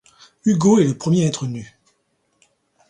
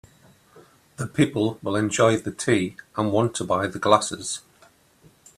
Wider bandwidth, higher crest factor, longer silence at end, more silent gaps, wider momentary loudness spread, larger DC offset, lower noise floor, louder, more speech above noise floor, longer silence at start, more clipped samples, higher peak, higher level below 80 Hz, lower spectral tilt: second, 10.5 kHz vs 14 kHz; second, 18 dB vs 24 dB; first, 1.25 s vs 1 s; neither; about the same, 13 LU vs 11 LU; neither; first, -67 dBFS vs -57 dBFS; first, -18 LUFS vs -23 LUFS; first, 50 dB vs 34 dB; about the same, 0.45 s vs 0.55 s; neither; about the same, -2 dBFS vs -2 dBFS; about the same, -58 dBFS vs -60 dBFS; first, -6.5 dB/octave vs -5 dB/octave